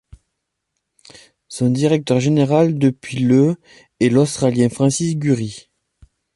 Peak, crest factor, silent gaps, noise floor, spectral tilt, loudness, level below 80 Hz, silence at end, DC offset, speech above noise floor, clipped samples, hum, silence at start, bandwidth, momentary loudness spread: -2 dBFS; 16 dB; none; -76 dBFS; -6.5 dB/octave; -17 LUFS; -54 dBFS; 0.75 s; under 0.1%; 60 dB; under 0.1%; none; 1.5 s; 11.5 kHz; 7 LU